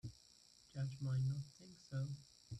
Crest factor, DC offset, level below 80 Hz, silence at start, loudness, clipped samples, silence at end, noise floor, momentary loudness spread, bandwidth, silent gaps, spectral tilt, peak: 12 dB; under 0.1%; -72 dBFS; 0.05 s; -45 LUFS; under 0.1%; 0 s; -68 dBFS; 23 LU; 9.8 kHz; none; -7 dB/octave; -32 dBFS